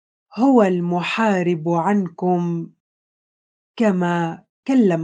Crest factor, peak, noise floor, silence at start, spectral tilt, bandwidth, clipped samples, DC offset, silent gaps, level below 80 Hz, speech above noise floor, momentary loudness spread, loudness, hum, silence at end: 18 dB; -2 dBFS; under -90 dBFS; 0.35 s; -7.5 dB/octave; 9.2 kHz; under 0.1%; under 0.1%; 2.80-3.74 s, 4.49-4.63 s; -70 dBFS; over 72 dB; 12 LU; -19 LUFS; none; 0 s